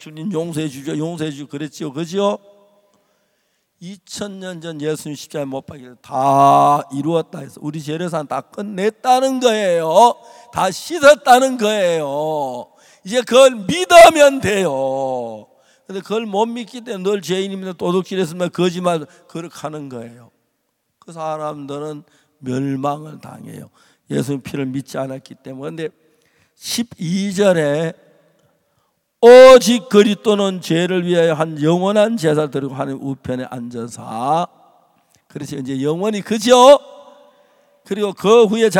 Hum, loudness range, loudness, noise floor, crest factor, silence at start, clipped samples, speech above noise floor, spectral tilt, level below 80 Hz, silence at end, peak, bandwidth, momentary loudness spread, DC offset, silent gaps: none; 15 LU; -15 LUFS; -70 dBFS; 16 dB; 0 s; 0.2%; 54 dB; -4.5 dB/octave; -54 dBFS; 0 s; 0 dBFS; 16.5 kHz; 19 LU; under 0.1%; none